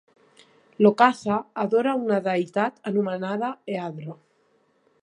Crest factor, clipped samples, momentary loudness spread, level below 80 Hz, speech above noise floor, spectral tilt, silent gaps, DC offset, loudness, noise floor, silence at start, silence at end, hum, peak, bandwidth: 22 dB; under 0.1%; 12 LU; -70 dBFS; 42 dB; -7 dB/octave; none; under 0.1%; -24 LUFS; -65 dBFS; 0.8 s; 0.9 s; none; -2 dBFS; 10 kHz